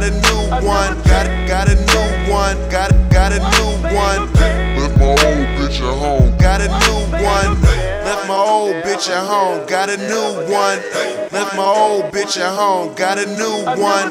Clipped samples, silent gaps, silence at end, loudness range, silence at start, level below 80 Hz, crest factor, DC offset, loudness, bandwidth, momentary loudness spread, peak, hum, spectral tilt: under 0.1%; none; 0 s; 3 LU; 0 s; -18 dBFS; 14 dB; under 0.1%; -15 LUFS; 15 kHz; 6 LU; 0 dBFS; none; -4.5 dB/octave